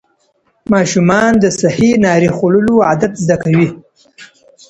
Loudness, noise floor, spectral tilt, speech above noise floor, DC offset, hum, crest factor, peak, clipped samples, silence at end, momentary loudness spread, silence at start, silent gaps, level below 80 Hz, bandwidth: -12 LUFS; -59 dBFS; -6 dB/octave; 48 dB; under 0.1%; none; 12 dB; 0 dBFS; under 0.1%; 0.45 s; 5 LU; 0.7 s; none; -44 dBFS; 8.8 kHz